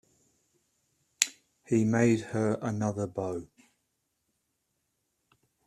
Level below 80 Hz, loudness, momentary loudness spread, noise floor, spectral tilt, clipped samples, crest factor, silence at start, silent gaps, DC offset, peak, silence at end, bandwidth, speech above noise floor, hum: -68 dBFS; -29 LUFS; 10 LU; -79 dBFS; -5 dB/octave; under 0.1%; 30 dB; 1.2 s; none; under 0.1%; -4 dBFS; 2.2 s; 13.5 kHz; 51 dB; none